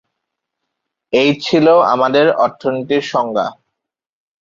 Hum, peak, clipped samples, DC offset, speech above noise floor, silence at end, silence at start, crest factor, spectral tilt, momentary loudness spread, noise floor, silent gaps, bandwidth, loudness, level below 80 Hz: none; -2 dBFS; under 0.1%; under 0.1%; 66 dB; 0.85 s; 1.1 s; 14 dB; -5.5 dB/octave; 9 LU; -80 dBFS; none; 7.6 kHz; -14 LUFS; -60 dBFS